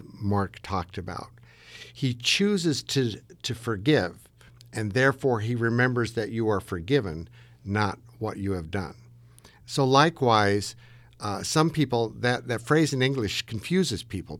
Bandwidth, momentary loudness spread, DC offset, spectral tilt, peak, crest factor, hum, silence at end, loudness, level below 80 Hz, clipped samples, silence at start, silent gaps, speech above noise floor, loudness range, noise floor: 16.5 kHz; 14 LU; under 0.1%; -5 dB/octave; -4 dBFS; 22 dB; none; 0 s; -26 LUFS; -54 dBFS; under 0.1%; 0 s; none; 27 dB; 4 LU; -53 dBFS